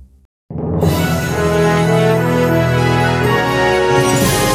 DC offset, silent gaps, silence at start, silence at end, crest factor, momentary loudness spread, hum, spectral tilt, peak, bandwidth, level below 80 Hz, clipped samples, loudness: under 0.1%; 0.25-0.49 s; 0 s; 0 s; 12 dB; 4 LU; none; -5.5 dB/octave; -2 dBFS; 17 kHz; -36 dBFS; under 0.1%; -14 LUFS